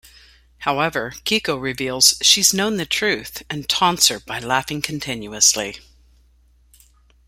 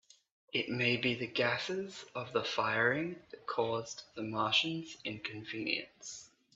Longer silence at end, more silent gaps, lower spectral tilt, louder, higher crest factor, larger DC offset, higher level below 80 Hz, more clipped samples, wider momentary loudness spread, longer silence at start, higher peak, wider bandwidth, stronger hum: first, 1.5 s vs 0.3 s; neither; second, -1.5 dB/octave vs -4 dB/octave; first, -18 LUFS vs -34 LUFS; about the same, 22 dB vs 20 dB; neither; first, -52 dBFS vs -74 dBFS; neither; about the same, 14 LU vs 13 LU; about the same, 0.6 s vs 0.55 s; first, 0 dBFS vs -16 dBFS; first, 16.5 kHz vs 8.2 kHz; neither